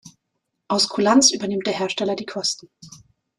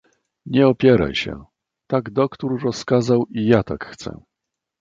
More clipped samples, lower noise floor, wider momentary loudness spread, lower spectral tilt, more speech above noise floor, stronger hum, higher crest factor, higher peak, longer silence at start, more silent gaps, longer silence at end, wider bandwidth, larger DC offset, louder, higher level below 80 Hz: neither; second, -77 dBFS vs -82 dBFS; second, 10 LU vs 15 LU; second, -2.5 dB/octave vs -7 dB/octave; second, 56 dB vs 64 dB; neither; about the same, 20 dB vs 18 dB; about the same, -4 dBFS vs -2 dBFS; second, 0.05 s vs 0.45 s; neither; second, 0.4 s vs 0.65 s; first, 13 kHz vs 7.8 kHz; neither; about the same, -20 LUFS vs -19 LUFS; second, -64 dBFS vs -46 dBFS